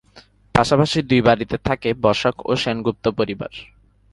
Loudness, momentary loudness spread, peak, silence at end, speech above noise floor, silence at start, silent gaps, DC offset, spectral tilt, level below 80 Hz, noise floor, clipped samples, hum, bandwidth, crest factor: -19 LUFS; 8 LU; 0 dBFS; 0.5 s; 31 dB; 0.15 s; none; under 0.1%; -6 dB/octave; -44 dBFS; -50 dBFS; under 0.1%; none; 11.5 kHz; 20 dB